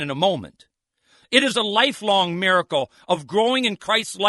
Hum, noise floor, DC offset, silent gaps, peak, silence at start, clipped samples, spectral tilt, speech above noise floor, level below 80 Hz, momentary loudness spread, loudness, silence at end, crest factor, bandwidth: none; -61 dBFS; under 0.1%; none; 0 dBFS; 0 s; under 0.1%; -3.5 dB/octave; 41 dB; -66 dBFS; 7 LU; -20 LUFS; 0 s; 22 dB; 11.5 kHz